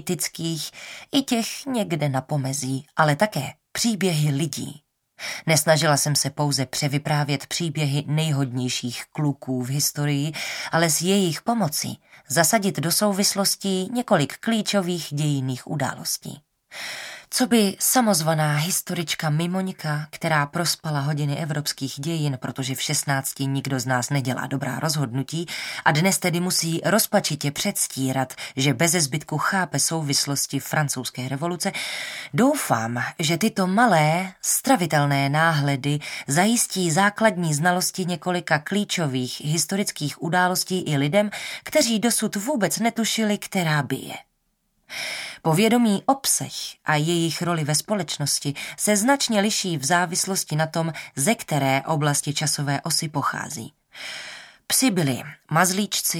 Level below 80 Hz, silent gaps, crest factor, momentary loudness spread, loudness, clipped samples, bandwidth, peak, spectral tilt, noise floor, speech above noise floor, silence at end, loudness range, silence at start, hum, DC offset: -66 dBFS; none; 20 dB; 9 LU; -22 LUFS; under 0.1%; 17.5 kHz; -2 dBFS; -4 dB/octave; -70 dBFS; 48 dB; 0 s; 4 LU; 0 s; none; under 0.1%